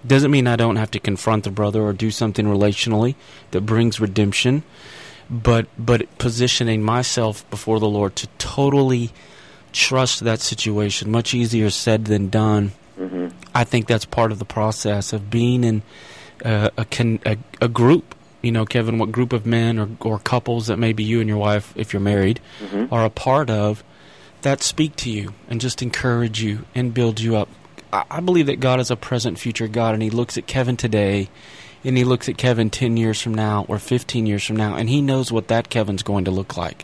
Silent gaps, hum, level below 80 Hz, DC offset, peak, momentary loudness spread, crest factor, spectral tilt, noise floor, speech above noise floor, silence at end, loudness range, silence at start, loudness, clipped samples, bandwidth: none; none; -46 dBFS; 0.2%; -2 dBFS; 8 LU; 16 dB; -5.5 dB/octave; -46 dBFS; 27 dB; 0.1 s; 2 LU; 0 s; -20 LUFS; under 0.1%; 11 kHz